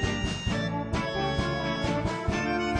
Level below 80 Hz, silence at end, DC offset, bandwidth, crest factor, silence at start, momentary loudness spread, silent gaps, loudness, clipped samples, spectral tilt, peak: -40 dBFS; 0 s; under 0.1%; 10.5 kHz; 14 dB; 0 s; 2 LU; none; -29 LUFS; under 0.1%; -5.5 dB/octave; -14 dBFS